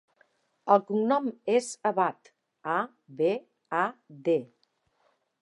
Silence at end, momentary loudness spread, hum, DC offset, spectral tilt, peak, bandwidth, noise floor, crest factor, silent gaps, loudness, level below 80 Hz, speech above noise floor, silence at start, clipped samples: 0.95 s; 10 LU; none; under 0.1%; -5 dB/octave; -8 dBFS; 11.5 kHz; -72 dBFS; 22 dB; none; -28 LUFS; -88 dBFS; 45 dB; 0.65 s; under 0.1%